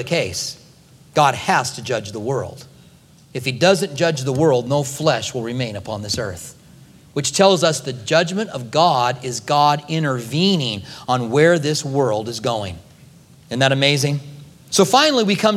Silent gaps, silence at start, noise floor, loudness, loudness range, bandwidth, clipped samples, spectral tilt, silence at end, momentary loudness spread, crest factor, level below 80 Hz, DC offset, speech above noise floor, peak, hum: none; 0 s; -48 dBFS; -18 LUFS; 3 LU; 16 kHz; under 0.1%; -4 dB/octave; 0 s; 12 LU; 18 dB; -56 dBFS; under 0.1%; 30 dB; 0 dBFS; none